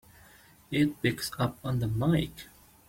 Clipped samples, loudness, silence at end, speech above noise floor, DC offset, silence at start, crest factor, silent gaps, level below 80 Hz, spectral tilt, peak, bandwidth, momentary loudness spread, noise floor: under 0.1%; -30 LUFS; 0.45 s; 28 dB; under 0.1%; 0.7 s; 18 dB; none; -52 dBFS; -6 dB/octave; -12 dBFS; 16.5 kHz; 11 LU; -57 dBFS